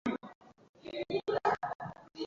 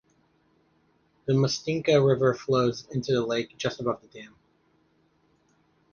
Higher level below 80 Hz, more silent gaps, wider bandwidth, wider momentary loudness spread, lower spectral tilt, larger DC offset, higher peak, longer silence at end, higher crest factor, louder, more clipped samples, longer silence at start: second, -70 dBFS vs -62 dBFS; first, 0.35-0.41 s, 0.69-0.74 s, 1.75-1.79 s vs none; about the same, 7.6 kHz vs 7.2 kHz; first, 17 LU vs 14 LU; second, -3.5 dB/octave vs -6 dB/octave; neither; second, -16 dBFS vs -8 dBFS; second, 0 s vs 1.65 s; about the same, 20 dB vs 20 dB; second, -36 LUFS vs -26 LUFS; neither; second, 0.05 s vs 1.25 s